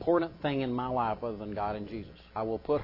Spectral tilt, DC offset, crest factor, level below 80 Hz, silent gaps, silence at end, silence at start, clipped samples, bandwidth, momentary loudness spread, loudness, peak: -9.5 dB/octave; under 0.1%; 18 dB; -54 dBFS; none; 0 s; 0 s; under 0.1%; 5.8 kHz; 11 LU; -33 LUFS; -14 dBFS